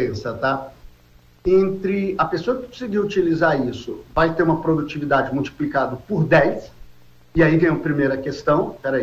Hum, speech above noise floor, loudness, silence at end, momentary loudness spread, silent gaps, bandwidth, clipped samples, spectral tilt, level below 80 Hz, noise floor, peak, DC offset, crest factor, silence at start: 60 Hz at -50 dBFS; 31 dB; -20 LUFS; 0 s; 9 LU; none; 14.5 kHz; under 0.1%; -7.5 dB/octave; -44 dBFS; -51 dBFS; -6 dBFS; under 0.1%; 14 dB; 0 s